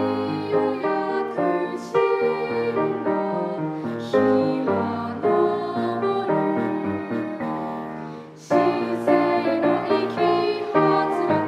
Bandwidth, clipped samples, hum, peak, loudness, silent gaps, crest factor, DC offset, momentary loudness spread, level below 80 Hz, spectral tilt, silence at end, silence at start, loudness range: 11 kHz; under 0.1%; none; -4 dBFS; -23 LUFS; none; 18 dB; under 0.1%; 8 LU; -68 dBFS; -7.5 dB/octave; 0 s; 0 s; 3 LU